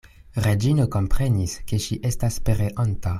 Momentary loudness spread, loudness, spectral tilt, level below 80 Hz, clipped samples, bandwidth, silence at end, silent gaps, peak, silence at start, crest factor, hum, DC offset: 6 LU; -24 LUFS; -6 dB/octave; -32 dBFS; under 0.1%; 15 kHz; 0 s; none; -8 dBFS; 0.35 s; 14 dB; none; under 0.1%